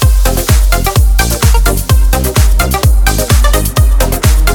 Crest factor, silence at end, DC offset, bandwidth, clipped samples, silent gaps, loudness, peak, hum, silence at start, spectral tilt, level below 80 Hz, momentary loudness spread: 8 dB; 0 s; under 0.1%; 20 kHz; under 0.1%; none; -10 LUFS; 0 dBFS; none; 0 s; -4.5 dB/octave; -10 dBFS; 1 LU